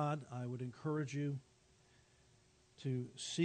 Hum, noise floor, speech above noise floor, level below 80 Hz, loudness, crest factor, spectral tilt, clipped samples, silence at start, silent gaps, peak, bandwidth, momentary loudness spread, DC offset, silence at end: none; -70 dBFS; 29 dB; -78 dBFS; -43 LUFS; 18 dB; -6 dB/octave; under 0.1%; 0 s; none; -24 dBFS; 9 kHz; 5 LU; under 0.1%; 0 s